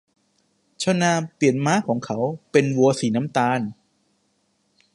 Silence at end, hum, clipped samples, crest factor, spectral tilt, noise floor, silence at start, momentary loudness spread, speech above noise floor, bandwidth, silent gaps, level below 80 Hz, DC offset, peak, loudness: 1.25 s; none; under 0.1%; 20 dB; -5.5 dB/octave; -68 dBFS; 0.8 s; 7 LU; 47 dB; 11.5 kHz; none; -66 dBFS; under 0.1%; -2 dBFS; -21 LUFS